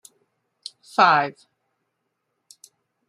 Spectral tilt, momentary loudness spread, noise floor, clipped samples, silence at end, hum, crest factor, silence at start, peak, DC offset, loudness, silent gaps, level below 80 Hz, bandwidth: -4 dB/octave; 23 LU; -77 dBFS; under 0.1%; 1.8 s; none; 24 dB; 1 s; -2 dBFS; under 0.1%; -19 LUFS; none; -78 dBFS; 14.5 kHz